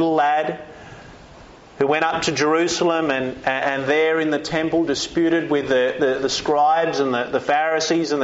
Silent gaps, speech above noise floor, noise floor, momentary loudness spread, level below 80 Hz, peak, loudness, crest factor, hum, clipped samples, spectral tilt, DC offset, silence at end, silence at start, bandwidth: none; 24 dB; -44 dBFS; 5 LU; -54 dBFS; -6 dBFS; -20 LUFS; 14 dB; none; under 0.1%; -2.5 dB/octave; under 0.1%; 0 s; 0 s; 8 kHz